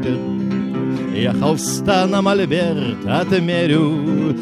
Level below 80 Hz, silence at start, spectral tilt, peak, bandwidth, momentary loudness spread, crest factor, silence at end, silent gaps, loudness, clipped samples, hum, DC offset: -50 dBFS; 0 s; -5.5 dB/octave; -2 dBFS; 14.5 kHz; 6 LU; 14 dB; 0 s; none; -18 LUFS; under 0.1%; none; under 0.1%